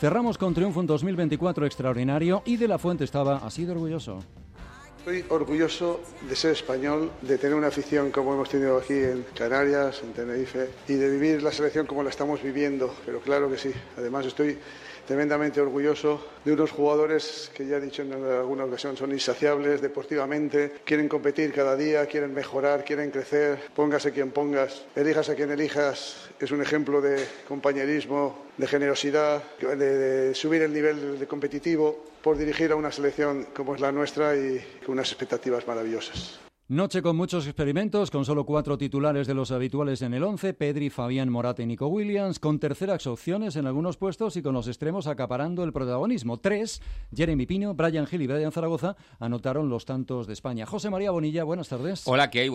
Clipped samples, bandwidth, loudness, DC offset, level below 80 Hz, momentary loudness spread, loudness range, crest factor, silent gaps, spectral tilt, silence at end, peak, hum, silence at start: under 0.1%; 12.5 kHz; -27 LUFS; under 0.1%; -52 dBFS; 8 LU; 3 LU; 16 dB; none; -6 dB/octave; 0 s; -10 dBFS; none; 0 s